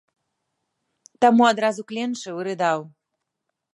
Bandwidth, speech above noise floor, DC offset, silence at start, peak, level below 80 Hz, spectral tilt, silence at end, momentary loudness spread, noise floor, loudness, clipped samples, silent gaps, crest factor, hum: 11 kHz; 60 dB; under 0.1%; 1.2 s; -4 dBFS; -76 dBFS; -4.5 dB/octave; 0.85 s; 13 LU; -81 dBFS; -21 LUFS; under 0.1%; none; 20 dB; none